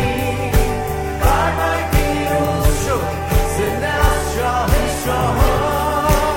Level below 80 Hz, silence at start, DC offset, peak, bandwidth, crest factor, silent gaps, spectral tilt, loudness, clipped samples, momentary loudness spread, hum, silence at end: -22 dBFS; 0 s; under 0.1%; -2 dBFS; 16.5 kHz; 16 dB; none; -5 dB/octave; -18 LUFS; under 0.1%; 3 LU; none; 0 s